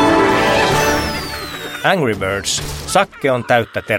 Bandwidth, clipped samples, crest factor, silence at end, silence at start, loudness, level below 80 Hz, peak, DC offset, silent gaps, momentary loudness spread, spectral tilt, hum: 17 kHz; under 0.1%; 16 dB; 0 s; 0 s; -16 LUFS; -36 dBFS; 0 dBFS; under 0.1%; none; 9 LU; -4 dB/octave; none